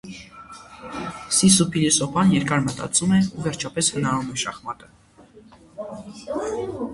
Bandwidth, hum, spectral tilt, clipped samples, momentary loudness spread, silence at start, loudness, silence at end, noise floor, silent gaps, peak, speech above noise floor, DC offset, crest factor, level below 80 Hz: 11.5 kHz; none; -4 dB/octave; under 0.1%; 21 LU; 0.05 s; -21 LUFS; 0 s; -49 dBFS; none; -2 dBFS; 28 dB; under 0.1%; 20 dB; -52 dBFS